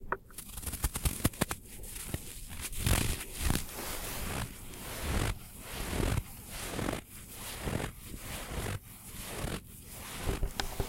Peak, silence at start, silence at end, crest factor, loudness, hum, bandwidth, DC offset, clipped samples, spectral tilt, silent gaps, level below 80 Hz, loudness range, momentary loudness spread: -12 dBFS; 0 s; 0 s; 24 dB; -37 LUFS; none; 17 kHz; under 0.1%; under 0.1%; -4 dB/octave; none; -42 dBFS; 5 LU; 11 LU